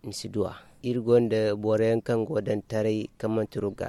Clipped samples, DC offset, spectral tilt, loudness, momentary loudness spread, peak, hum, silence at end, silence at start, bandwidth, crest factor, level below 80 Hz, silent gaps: under 0.1%; under 0.1%; -7 dB/octave; -27 LUFS; 9 LU; -10 dBFS; none; 0 s; 0.05 s; 13 kHz; 16 dB; -58 dBFS; none